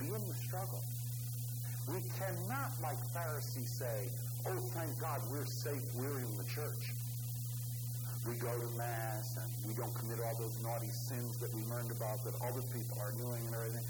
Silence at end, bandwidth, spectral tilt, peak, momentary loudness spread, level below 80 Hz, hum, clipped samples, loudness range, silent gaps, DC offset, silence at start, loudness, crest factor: 0 s; over 20 kHz; -5.5 dB/octave; -24 dBFS; 2 LU; -66 dBFS; 60 Hz at -40 dBFS; under 0.1%; 1 LU; none; under 0.1%; 0 s; -40 LUFS; 16 dB